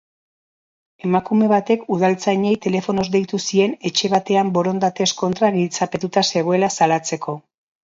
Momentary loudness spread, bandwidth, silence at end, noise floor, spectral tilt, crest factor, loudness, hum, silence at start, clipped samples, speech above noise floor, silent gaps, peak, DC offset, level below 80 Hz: 5 LU; 7.8 kHz; 0.45 s; under -90 dBFS; -4.5 dB/octave; 18 dB; -19 LUFS; none; 1.05 s; under 0.1%; over 72 dB; none; -2 dBFS; under 0.1%; -60 dBFS